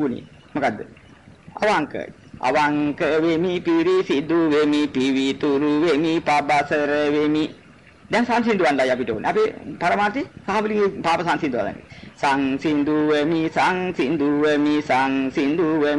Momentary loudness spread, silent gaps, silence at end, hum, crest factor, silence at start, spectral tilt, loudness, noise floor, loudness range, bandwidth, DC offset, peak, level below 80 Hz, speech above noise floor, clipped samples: 7 LU; none; 0 s; none; 10 dB; 0 s; -5.5 dB/octave; -20 LUFS; -48 dBFS; 3 LU; 11 kHz; 0.1%; -10 dBFS; -56 dBFS; 28 dB; under 0.1%